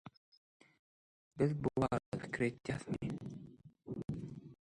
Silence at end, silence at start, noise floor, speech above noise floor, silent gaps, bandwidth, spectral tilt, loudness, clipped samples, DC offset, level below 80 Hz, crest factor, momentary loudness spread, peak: 0.15 s; 0.05 s; under -90 dBFS; over 54 dB; 0.17-0.60 s, 0.79-1.31 s, 2.06-2.12 s; 11.5 kHz; -7.5 dB/octave; -40 LUFS; under 0.1%; under 0.1%; -64 dBFS; 20 dB; 21 LU; -20 dBFS